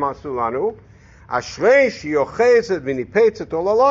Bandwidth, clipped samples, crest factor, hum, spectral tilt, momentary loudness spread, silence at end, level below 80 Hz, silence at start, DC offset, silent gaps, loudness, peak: 7.6 kHz; under 0.1%; 14 dB; none; -3.5 dB/octave; 10 LU; 0 s; -50 dBFS; 0 s; under 0.1%; none; -18 LUFS; -4 dBFS